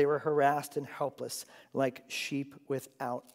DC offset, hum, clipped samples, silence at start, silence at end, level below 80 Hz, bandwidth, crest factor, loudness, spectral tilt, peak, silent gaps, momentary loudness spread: under 0.1%; none; under 0.1%; 0 s; 0.15 s; -88 dBFS; 16 kHz; 20 dB; -34 LUFS; -4.5 dB/octave; -14 dBFS; none; 12 LU